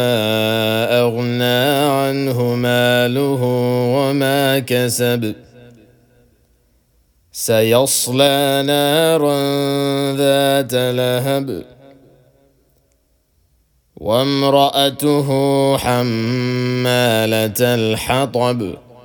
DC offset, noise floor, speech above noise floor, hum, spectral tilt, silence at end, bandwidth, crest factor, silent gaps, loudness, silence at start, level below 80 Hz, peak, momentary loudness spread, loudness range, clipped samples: under 0.1%; -60 dBFS; 45 dB; none; -4.5 dB/octave; 0.25 s; 19.5 kHz; 16 dB; none; -16 LUFS; 0 s; -52 dBFS; 0 dBFS; 5 LU; 6 LU; under 0.1%